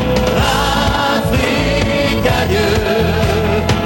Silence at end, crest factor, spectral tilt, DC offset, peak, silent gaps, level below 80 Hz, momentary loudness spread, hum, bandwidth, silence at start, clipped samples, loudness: 0 s; 14 dB; -5 dB/octave; under 0.1%; 0 dBFS; none; -24 dBFS; 1 LU; none; 17 kHz; 0 s; under 0.1%; -14 LUFS